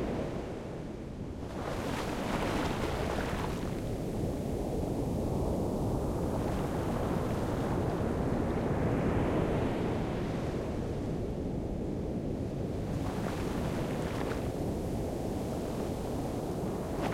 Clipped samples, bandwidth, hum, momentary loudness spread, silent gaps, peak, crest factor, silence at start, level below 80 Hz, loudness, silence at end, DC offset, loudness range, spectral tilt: under 0.1%; 16.5 kHz; none; 5 LU; none; -18 dBFS; 14 dB; 0 s; -42 dBFS; -34 LUFS; 0 s; under 0.1%; 3 LU; -7 dB/octave